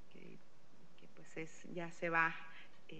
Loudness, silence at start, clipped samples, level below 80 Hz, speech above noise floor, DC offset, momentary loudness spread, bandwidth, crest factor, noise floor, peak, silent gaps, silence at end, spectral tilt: -40 LUFS; 0.15 s; under 0.1%; -82 dBFS; 27 dB; 0.5%; 24 LU; 9.2 kHz; 26 dB; -68 dBFS; -18 dBFS; none; 0 s; -5 dB/octave